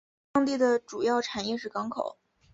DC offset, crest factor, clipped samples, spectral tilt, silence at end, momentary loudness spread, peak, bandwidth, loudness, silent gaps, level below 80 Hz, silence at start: under 0.1%; 16 dB; under 0.1%; -4 dB/octave; 0.4 s; 9 LU; -12 dBFS; 8 kHz; -29 LUFS; none; -66 dBFS; 0.35 s